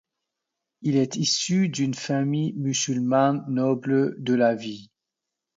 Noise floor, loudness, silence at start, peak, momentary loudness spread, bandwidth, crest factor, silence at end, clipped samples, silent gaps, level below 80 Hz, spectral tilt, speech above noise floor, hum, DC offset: -85 dBFS; -24 LUFS; 0.8 s; -8 dBFS; 5 LU; 7.8 kHz; 16 dB; 0.75 s; under 0.1%; none; -70 dBFS; -5 dB/octave; 62 dB; none; under 0.1%